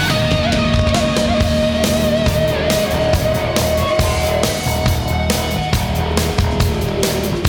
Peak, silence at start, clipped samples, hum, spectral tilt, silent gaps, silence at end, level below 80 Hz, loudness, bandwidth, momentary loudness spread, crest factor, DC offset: -2 dBFS; 0 s; under 0.1%; none; -5 dB/octave; none; 0 s; -24 dBFS; -16 LUFS; over 20 kHz; 3 LU; 14 dB; under 0.1%